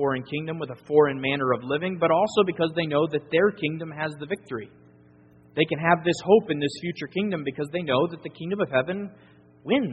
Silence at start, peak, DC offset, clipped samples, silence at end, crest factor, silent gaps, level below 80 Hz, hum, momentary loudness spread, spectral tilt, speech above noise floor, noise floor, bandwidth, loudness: 0 s; -4 dBFS; under 0.1%; under 0.1%; 0 s; 22 dB; none; -64 dBFS; none; 12 LU; -4.5 dB/octave; 29 dB; -54 dBFS; 8 kHz; -25 LUFS